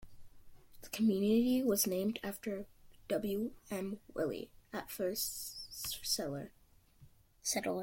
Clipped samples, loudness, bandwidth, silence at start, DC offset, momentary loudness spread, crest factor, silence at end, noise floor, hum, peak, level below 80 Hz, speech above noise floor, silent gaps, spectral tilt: under 0.1%; -37 LUFS; 16.5 kHz; 0 s; under 0.1%; 15 LU; 18 dB; 0 s; -63 dBFS; none; -20 dBFS; -64 dBFS; 27 dB; none; -4 dB/octave